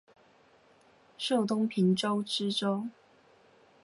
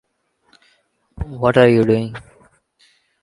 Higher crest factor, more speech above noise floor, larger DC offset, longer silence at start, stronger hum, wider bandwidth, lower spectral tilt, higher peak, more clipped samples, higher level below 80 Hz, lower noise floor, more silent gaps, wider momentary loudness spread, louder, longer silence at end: about the same, 16 dB vs 20 dB; second, 33 dB vs 49 dB; neither; about the same, 1.2 s vs 1.2 s; neither; about the same, 11.5 kHz vs 11 kHz; second, -5.5 dB/octave vs -8 dB/octave; second, -18 dBFS vs 0 dBFS; neither; second, -80 dBFS vs -42 dBFS; about the same, -62 dBFS vs -64 dBFS; neither; second, 9 LU vs 20 LU; second, -30 LUFS vs -15 LUFS; about the same, 0.95 s vs 1.05 s